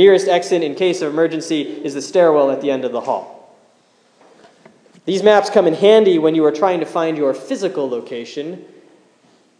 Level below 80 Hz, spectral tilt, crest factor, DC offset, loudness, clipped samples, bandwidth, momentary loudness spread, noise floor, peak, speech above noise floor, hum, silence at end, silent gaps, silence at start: -68 dBFS; -5 dB/octave; 16 dB; under 0.1%; -16 LUFS; under 0.1%; 10.5 kHz; 14 LU; -55 dBFS; 0 dBFS; 40 dB; none; 0.95 s; none; 0 s